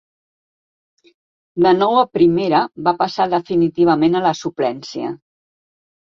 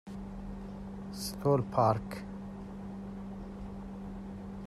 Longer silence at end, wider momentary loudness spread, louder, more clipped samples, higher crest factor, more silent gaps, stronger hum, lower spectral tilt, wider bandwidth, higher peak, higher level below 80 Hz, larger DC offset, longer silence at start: first, 0.95 s vs 0 s; second, 12 LU vs 15 LU; first, -17 LUFS vs -36 LUFS; neither; about the same, 16 dB vs 20 dB; neither; neither; about the same, -6.5 dB/octave vs -6.5 dB/octave; second, 7.2 kHz vs 14 kHz; first, -2 dBFS vs -16 dBFS; second, -58 dBFS vs -52 dBFS; neither; first, 1.55 s vs 0.05 s